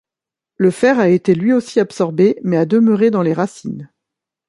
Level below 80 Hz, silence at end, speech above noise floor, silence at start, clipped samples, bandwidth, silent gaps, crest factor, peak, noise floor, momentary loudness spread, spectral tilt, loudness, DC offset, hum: -62 dBFS; 0.65 s; 73 dB; 0.6 s; under 0.1%; 11.5 kHz; none; 14 dB; -2 dBFS; -87 dBFS; 9 LU; -7.5 dB/octave; -15 LUFS; under 0.1%; none